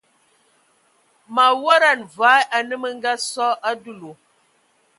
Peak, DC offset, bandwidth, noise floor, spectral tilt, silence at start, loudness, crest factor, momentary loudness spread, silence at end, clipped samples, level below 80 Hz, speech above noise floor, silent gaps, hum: 0 dBFS; under 0.1%; 11.5 kHz; -62 dBFS; -1 dB/octave; 1.3 s; -18 LUFS; 20 dB; 12 LU; 0.85 s; under 0.1%; -80 dBFS; 43 dB; none; none